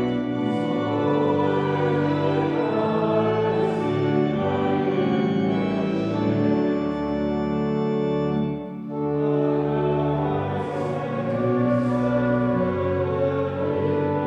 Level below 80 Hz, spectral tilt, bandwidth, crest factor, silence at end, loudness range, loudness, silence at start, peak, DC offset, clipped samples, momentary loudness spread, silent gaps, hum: -50 dBFS; -9 dB/octave; 8.2 kHz; 14 dB; 0 s; 2 LU; -23 LUFS; 0 s; -8 dBFS; under 0.1%; under 0.1%; 4 LU; none; none